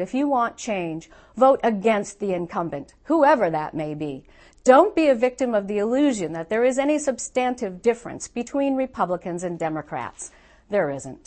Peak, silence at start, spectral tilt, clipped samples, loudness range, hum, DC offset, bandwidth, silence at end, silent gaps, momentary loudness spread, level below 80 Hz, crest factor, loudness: -2 dBFS; 0 s; -5 dB/octave; under 0.1%; 6 LU; none; under 0.1%; 8.8 kHz; 0.1 s; none; 14 LU; -56 dBFS; 20 dB; -22 LUFS